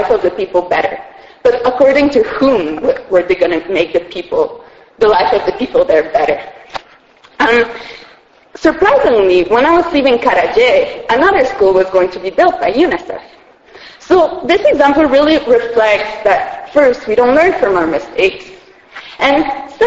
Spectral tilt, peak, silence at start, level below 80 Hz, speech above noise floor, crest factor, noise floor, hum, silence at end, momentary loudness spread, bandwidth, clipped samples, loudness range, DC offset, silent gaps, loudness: -5 dB/octave; 0 dBFS; 0 s; -42 dBFS; 33 dB; 12 dB; -44 dBFS; none; 0 s; 9 LU; 8 kHz; under 0.1%; 4 LU; under 0.1%; none; -12 LUFS